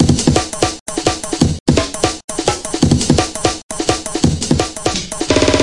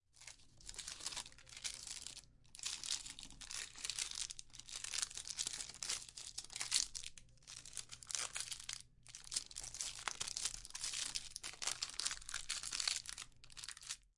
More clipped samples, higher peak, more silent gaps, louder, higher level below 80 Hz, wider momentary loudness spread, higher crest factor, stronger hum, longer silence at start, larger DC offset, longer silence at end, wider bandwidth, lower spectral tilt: neither; first, 0 dBFS vs -16 dBFS; first, 0.81-0.86 s, 1.60-1.66 s, 2.24-2.28 s, 3.63-3.69 s vs none; first, -16 LUFS vs -43 LUFS; first, -32 dBFS vs -66 dBFS; second, 6 LU vs 13 LU; second, 16 dB vs 32 dB; neither; second, 0 s vs 0.15 s; first, 0.8% vs under 0.1%; about the same, 0 s vs 0.1 s; about the same, 11.5 kHz vs 11.5 kHz; first, -4.5 dB/octave vs 1.5 dB/octave